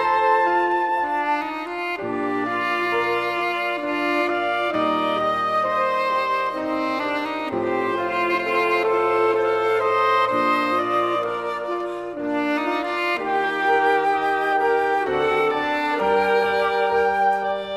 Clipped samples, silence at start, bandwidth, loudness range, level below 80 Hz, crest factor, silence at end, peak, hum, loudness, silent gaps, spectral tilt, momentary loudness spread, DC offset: under 0.1%; 0 s; 14 kHz; 3 LU; -60 dBFS; 14 dB; 0 s; -8 dBFS; none; -21 LUFS; none; -5 dB/octave; 6 LU; under 0.1%